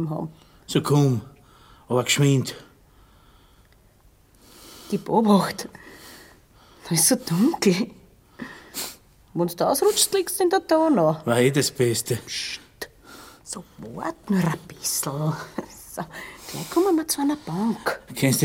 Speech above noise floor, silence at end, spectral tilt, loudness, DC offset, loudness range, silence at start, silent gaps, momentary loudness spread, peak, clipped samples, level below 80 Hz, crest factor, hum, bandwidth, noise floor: 33 dB; 0 s; -4.5 dB/octave; -23 LUFS; under 0.1%; 7 LU; 0 s; none; 20 LU; -4 dBFS; under 0.1%; -58 dBFS; 20 dB; none; 17 kHz; -56 dBFS